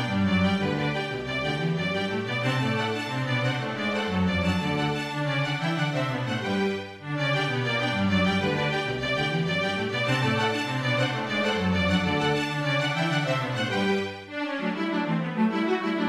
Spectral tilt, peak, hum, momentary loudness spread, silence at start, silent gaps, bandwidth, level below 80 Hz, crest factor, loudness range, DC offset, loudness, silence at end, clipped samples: -6 dB/octave; -10 dBFS; none; 5 LU; 0 s; none; 14 kHz; -48 dBFS; 16 dB; 2 LU; under 0.1%; -26 LUFS; 0 s; under 0.1%